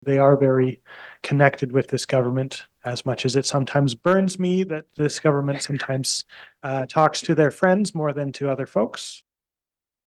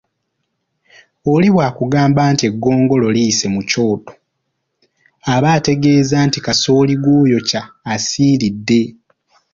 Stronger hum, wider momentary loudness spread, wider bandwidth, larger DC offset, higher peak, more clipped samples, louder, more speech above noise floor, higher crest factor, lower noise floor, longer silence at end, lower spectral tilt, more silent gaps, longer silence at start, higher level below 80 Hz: neither; first, 12 LU vs 7 LU; first, 12.5 kHz vs 7.6 kHz; neither; about the same, -2 dBFS vs 0 dBFS; neither; second, -22 LUFS vs -14 LUFS; first, over 69 dB vs 58 dB; first, 20 dB vs 14 dB; first, under -90 dBFS vs -71 dBFS; first, 0.9 s vs 0.65 s; about the same, -5.5 dB/octave vs -5.5 dB/octave; neither; second, 0.05 s vs 1.25 s; second, -64 dBFS vs -48 dBFS